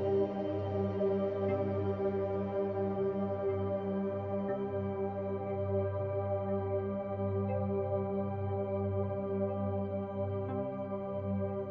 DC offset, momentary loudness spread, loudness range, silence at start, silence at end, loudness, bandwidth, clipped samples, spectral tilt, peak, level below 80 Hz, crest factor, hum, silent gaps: under 0.1%; 4 LU; 2 LU; 0 s; 0 s; -35 LUFS; 5 kHz; under 0.1%; -9 dB/octave; -20 dBFS; -54 dBFS; 14 dB; none; none